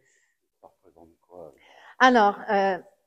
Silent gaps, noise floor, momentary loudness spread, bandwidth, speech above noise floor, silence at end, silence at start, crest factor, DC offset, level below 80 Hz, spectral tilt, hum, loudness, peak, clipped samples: none; -70 dBFS; 7 LU; 9.2 kHz; 48 dB; 0.25 s; 1.35 s; 24 dB; under 0.1%; -72 dBFS; -4.5 dB/octave; none; -21 LUFS; -2 dBFS; under 0.1%